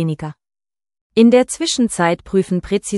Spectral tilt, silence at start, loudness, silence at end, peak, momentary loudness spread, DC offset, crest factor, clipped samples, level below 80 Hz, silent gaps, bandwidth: -5 dB/octave; 0 s; -16 LUFS; 0 s; 0 dBFS; 11 LU; under 0.1%; 16 dB; under 0.1%; -46 dBFS; 1.01-1.10 s; 12 kHz